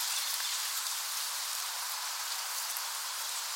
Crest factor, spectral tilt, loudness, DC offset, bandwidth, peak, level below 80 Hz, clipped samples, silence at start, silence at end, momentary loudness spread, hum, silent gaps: 20 dB; 9 dB/octave; -33 LUFS; under 0.1%; 17 kHz; -16 dBFS; under -90 dBFS; under 0.1%; 0 s; 0 s; 3 LU; none; none